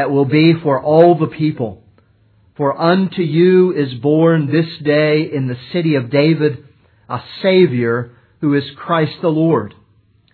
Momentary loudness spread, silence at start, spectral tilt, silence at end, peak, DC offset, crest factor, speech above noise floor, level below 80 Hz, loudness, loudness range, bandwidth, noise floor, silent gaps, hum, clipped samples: 11 LU; 0 s; -10.5 dB/octave; 0.65 s; 0 dBFS; under 0.1%; 14 dB; 40 dB; -60 dBFS; -15 LUFS; 3 LU; 4.6 kHz; -54 dBFS; none; none; under 0.1%